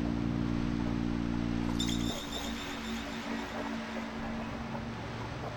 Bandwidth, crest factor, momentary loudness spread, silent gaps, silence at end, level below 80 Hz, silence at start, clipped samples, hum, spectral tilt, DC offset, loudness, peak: 18 kHz; 16 dB; 7 LU; none; 0 s; -44 dBFS; 0 s; under 0.1%; none; -5.5 dB/octave; under 0.1%; -35 LUFS; -18 dBFS